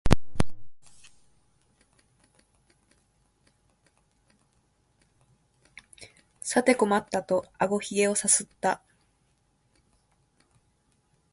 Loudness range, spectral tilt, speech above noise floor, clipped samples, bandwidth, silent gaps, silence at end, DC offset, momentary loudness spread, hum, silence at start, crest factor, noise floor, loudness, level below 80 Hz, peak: 9 LU; -4 dB/octave; 44 dB; under 0.1%; 13 kHz; none; 2.55 s; under 0.1%; 26 LU; none; 0.05 s; 30 dB; -69 dBFS; -26 LUFS; -44 dBFS; 0 dBFS